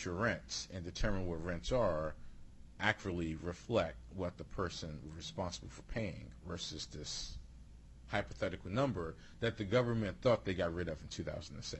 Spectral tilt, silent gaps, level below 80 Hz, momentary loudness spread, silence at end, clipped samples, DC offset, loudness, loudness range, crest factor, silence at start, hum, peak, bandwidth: -5 dB/octave; none; -52 dBFS; 12 LU; 0 s; under 0.1%; under 0.1%; -39 LUFS; 7 LU; 24 dB; 0 s; none; -16 dBFS; 11.5 kHz